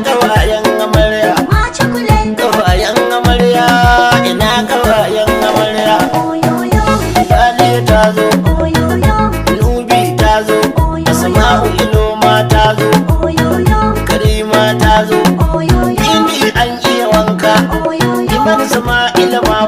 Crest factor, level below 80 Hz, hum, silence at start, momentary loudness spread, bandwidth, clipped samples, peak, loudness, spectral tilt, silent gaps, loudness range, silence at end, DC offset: 10 dB; -20 dBFS; none; 0 s; 4 LU; 16.5 kHz; under 0.1%; 0 dBFS; -10 LUFS; -5 dB/octave; none; 1 LU; 0 s; under 0.1%